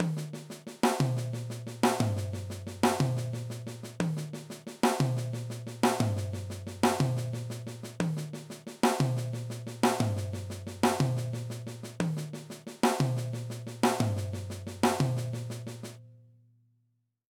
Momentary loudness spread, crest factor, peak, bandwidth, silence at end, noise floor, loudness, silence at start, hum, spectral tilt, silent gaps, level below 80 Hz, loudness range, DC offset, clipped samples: 13 LU; 20 dB; -10 dBFS; 19 kHz; 1.1 s; -75 dBFS; -31 LUFS; 0 s; none; -5.5 dB/octave; none; -64 dBFS; 1 LU; under 0.1%; under 0.1%